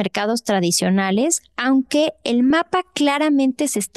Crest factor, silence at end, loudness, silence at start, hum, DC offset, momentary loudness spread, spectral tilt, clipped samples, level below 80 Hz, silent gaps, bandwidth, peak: 12 dB; 0.1 s; -18 LUFS; 0 s; none; under 0.1%; 4 LU; -4 dB/octave; under 0.1%; -62 dBFS; none; 12.5 kHz; -6 dBFS